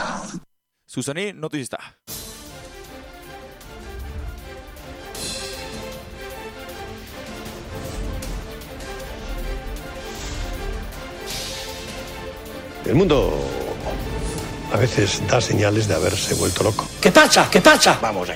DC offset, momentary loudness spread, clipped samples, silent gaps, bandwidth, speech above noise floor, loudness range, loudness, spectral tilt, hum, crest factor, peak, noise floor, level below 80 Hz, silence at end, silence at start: under 0.1%; 23 LU; under 0.1%; none; 16.5 kHz; 38 dB; 16 LU; -20 LUFS; -4 dB/octave; none; 20 dB; -2 dBFS; -55 dBFS; -36 dBFS; 0 s; 0 s